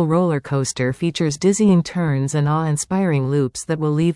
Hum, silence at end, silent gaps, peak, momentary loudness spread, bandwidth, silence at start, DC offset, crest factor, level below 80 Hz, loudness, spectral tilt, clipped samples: none; 0 s; none; -6 dBFS; 5 LU; 12 kHz; 0 s; under 0.1%; 12 dB; -52 dBFS; -19 LUFS; -6 dB/octave; under 0.1%